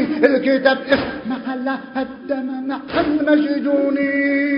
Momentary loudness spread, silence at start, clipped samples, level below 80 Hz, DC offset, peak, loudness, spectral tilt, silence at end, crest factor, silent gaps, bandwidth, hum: 9 LU; 0 s; under 0.1%; -50 dBFS; under 0.1%; 0 dBFS; -19 LUFS; -7.5 dB/octave; 0 s; 18 dB; none; 5.4 kHz; none